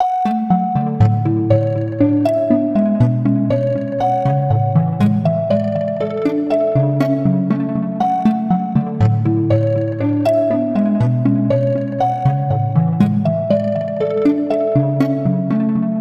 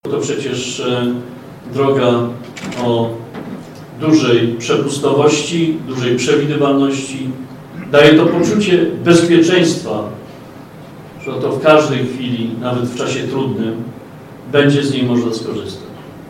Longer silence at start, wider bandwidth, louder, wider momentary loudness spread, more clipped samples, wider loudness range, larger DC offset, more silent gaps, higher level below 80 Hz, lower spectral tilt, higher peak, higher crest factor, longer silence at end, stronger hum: about the same, 0 s vs 0.05 s; second, 7.6 kHz vs 15 kHz; about the same, -16 LUFS vs -14 LUFS; second, 3 LU vs 21 LU; neither; second, 1 LU vs 5 LU; neither; neither; first, -46 dBFS vs -54 dBFS; first, -10 dB/octave vs -5.5 dB/octave; about the same, 0 dBFS vs 0 dBFS; about the same, 16 dB vs 14 dB; about the same, 0 s vs 0 s; neither